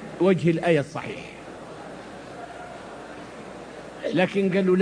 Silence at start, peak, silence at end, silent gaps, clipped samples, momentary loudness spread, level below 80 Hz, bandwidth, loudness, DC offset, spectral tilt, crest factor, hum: 0 s; -6 dBFS; 0 s; none; under 0.1%; 19 LU; -60 dBFS; 10.5 kHz; -23 LUFS; under 0.1%; -7 dB/octave; 20 dB; none